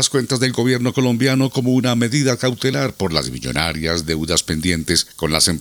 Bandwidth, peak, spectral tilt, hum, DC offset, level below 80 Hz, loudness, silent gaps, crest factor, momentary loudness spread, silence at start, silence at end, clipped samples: over 20 kHz; 0 dBFS; -4 dB/octave; none; under 0.1%; -42 dBFS; -18 LUFS; none; 18 dB; 4 LU; 0 s; 0 s; under 0.1%